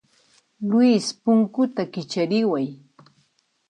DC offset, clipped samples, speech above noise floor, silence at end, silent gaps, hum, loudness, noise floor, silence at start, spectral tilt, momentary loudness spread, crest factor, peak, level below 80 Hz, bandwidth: under 0.1%; under 0.1%; 46 dB; 0.95 s; none; none; -22 LUFS; -67 dBFS; 0.6 s; -6 dB/octave; 11 LU; 16 dB; -8 dBFS; -74 dBFS; 10.5 kHz